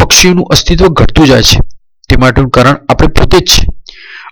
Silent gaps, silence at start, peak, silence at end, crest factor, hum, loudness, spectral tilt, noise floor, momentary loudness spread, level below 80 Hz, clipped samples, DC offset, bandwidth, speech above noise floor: none; 0 s; 0 dBFS; 0 s; 6 dB; none; -6 LUFS; -4 dB/octave; -29 dBFS; 6 LU; -14 dBFS; under 0.1%; under 0.1%; over 20 kHz; 24 dB